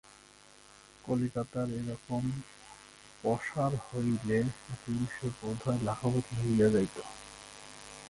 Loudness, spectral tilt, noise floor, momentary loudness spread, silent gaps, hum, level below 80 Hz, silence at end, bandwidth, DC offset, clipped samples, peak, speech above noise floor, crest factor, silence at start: -33 LUFS; -7 dB/octave; -58 dBFS; 19 LU; none; none; -58 dBFS; 0 s; 11.5 kHz; under 0.1%; under 0.1%; -16 dBFS; 26 dB; 18 dB; 1.05 s